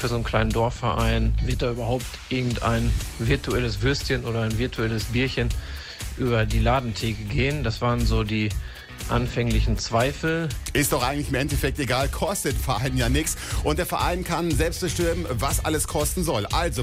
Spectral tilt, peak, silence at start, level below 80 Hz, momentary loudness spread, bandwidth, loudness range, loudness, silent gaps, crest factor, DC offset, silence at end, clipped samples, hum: -5 dB/octave; -8 dBFS; 0 s; -30 dBFS; 4 LU; 16 kHz; 1 LU; -24 LUFS; none; 16 dB; under 0.1%; 0 s; under 0.1%; none